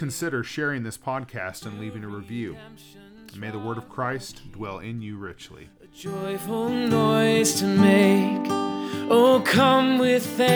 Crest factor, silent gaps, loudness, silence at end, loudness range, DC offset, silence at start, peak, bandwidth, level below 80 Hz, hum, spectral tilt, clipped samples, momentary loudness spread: 18 dB; none; -22 LUFS; 0 s; 15 LU; under 0.1%; 0 s; -4 dBFS; over 20 kHz; -60 dBFS; none; -5 dB/octave; under 0.1%; 19 LU